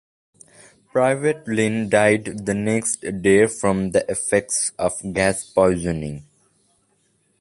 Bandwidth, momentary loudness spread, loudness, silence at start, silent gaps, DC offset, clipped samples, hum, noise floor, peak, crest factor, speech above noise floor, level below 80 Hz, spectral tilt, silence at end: 11.5 kHz; 8 LU; -20 LUFS; 0.95 s; none; under 0.1%; under 0.1%; none; -65 dBFS; -2 dBFS; 18 dB; 45 dB; -48 dBFS; -4.5 dB/octave; 1.2 s